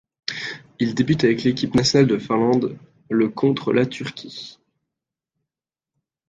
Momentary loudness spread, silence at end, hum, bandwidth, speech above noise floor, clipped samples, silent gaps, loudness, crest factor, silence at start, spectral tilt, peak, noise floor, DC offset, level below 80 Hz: 14 LU; 1.75 s; none; 9.2 kHz; 69 dB; under 0.1%; none; -20 LUFS; 18 dB; 0.3 s; -5.5 dB/octave; -4 dBFS; -89 dBFS; under 0.1%; -54 dBFS